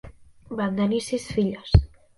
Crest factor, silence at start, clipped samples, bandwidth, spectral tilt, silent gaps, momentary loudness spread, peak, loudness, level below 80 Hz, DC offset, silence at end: 22 dB; 0.05 s; under 0.1%; 11.5 kHz; -7 dB/octave; none; 7 LU; -2 dBFS; -24 LUFS; -32 dBFS; under 0.1%; 0.3 s